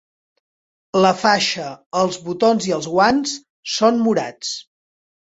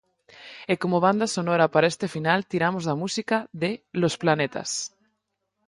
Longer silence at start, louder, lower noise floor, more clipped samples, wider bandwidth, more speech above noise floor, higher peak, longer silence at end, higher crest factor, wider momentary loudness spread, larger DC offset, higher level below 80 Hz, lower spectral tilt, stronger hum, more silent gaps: first, 0.95 s vs 0.4 s; first, -18 LUFS vs -24 LUFS; first, under -90 dBFS vs -78 dBFS; neither; second, 8.2 kHz vs 11.5 kHz; first, over 72 dB vs 54 dB; first, -2 dBFS vs -6 dBFS; second, 0.6 s vs 0.8 s; about the same, 18 dB vs 20 dB; first, 11 LU vs 8 LU; neither; first, -58 dBFS vs -66 dBFS; about the same, -4 dB/octave vs -4.5 dB/octave; neither; first, 1.86-1.91 s, 3.50-3.63 s vs none